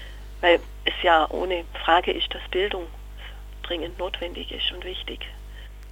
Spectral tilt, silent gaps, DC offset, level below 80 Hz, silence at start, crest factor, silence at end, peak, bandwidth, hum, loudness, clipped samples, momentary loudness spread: -5 dB/octave; none; under 0.1%; -38 dBFS; 0 s; 22 dB; 0 s; -4 dBFS; 17 kHz; 50 Hz at -40 dBFS; -24 LUFS; under 0.1%; 21 LU